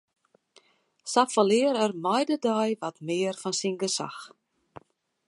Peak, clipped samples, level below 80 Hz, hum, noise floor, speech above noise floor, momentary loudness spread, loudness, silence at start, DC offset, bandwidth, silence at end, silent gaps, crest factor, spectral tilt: -6 dBFS; under 0.1%; -78 dBFS; none; -62 dBFS; 36 dB; 10 LU; -26 LUFS; 1.05 s; under 0.1%; 11.5 kHz; 1 s; none; 22 dB; -4 dB/octave